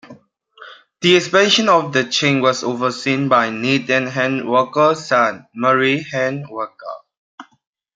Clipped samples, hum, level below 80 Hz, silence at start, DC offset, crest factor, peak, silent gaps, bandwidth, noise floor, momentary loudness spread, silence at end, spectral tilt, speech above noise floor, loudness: under 0.1%; none; -66 dBFS; 0.05 s; under 0.1%; 16 dB; -2 dBFS; 7.17-7.38 s; 9.4 kHz; -47 dBFS; 12 LU; 0.55 s; -4 dB/octave; 30 dB; -16 LUFS